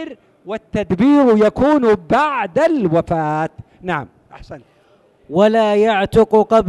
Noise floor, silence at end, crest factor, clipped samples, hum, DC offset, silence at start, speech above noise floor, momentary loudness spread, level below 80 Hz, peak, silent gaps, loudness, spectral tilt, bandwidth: -53 dBFS; 0 s; 12 dB; under 0.1%; none; under 0.1%; 0 s; 38 dB; 12 LU; -44 dBFS; -2 dBFS; none; -15 LUFS; -7 dB/octave; 12 kHz